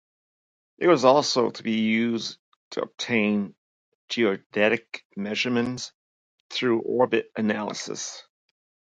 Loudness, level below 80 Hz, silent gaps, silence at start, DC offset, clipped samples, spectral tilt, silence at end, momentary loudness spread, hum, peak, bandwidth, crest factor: -25 LUFS; -72 dBFS; 2.39-2.71 s, 3.58-4.08 s, 4.46-4.50 s, 5.05-5.10 s, 5.94-6.50 s; 0.8 s; under 0.1%; under 0.1%; -4.5 dB/octave; 0.75 s; 15 LU; none; -4 dBFS; 9.2 kHz; 22 dB